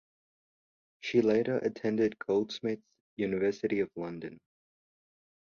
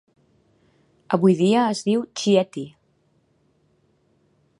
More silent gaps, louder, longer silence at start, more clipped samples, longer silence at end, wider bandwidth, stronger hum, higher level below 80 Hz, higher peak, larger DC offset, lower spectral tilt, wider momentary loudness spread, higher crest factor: first, 3.00-3.17 s vs none; second, -31 LUFS vs -20 LUFS; about the same, 1.05 s vs 1.1 s; neither; second, 1.1 s vs 1.9 s; second, 7.2 kHz vs 11 kHz; neither; about the same, -70 dBFS vs -70 dBFS; second, -14 dBFS vs -2 dBFS; neither; about the same, -6.5 dB/octave vs -6 dB/octave; about the same, 14 LU vs 14 LU; about the same, 20 dB vs 22 dB